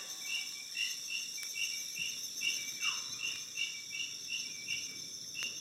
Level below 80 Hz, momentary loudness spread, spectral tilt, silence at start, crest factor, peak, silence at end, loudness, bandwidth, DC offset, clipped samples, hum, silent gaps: -86 dBFS; 4 LU; 2 dB/octave; 0 s; 20 dB; -20 dBFS; 0 s; -37 LUFS; 17 kHz; under 0.1%; under 0.1%; none; none